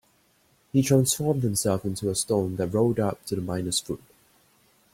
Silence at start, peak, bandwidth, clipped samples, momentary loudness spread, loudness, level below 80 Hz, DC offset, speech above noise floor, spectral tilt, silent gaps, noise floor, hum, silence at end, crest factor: 0.75 s; -8 dBFS; 16.5 kHz; under 0.1%; 8 LU; -25 LUFS; -56 dBFS; under 0.1%; 39 dB; -5 dB/octave; none; -64 dBFS; none; 0.95 s; 18 dB